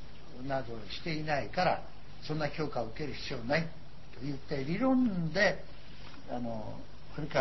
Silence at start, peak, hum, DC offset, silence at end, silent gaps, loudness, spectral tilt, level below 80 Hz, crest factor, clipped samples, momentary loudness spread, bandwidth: 0 s; -14 dBFS; none; 1%; 0 s; none; -34 LUFS; -6.5 dB/octave; -54 dBFS; 20 dB; under 0.1%; 21 LU; 6.2 kHz